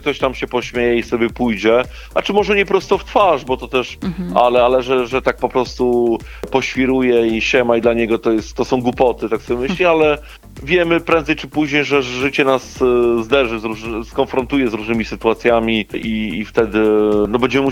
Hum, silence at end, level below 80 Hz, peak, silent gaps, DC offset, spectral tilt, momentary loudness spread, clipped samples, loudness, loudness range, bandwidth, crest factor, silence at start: none; 0 s; -38 dBFS; 0 dBFS; none; under 0.1%; -5.5 dB/octave; 7 LU; under 0.1%; -16 LUFS; 1 LU; 16 kHz; 16 dB; 0 s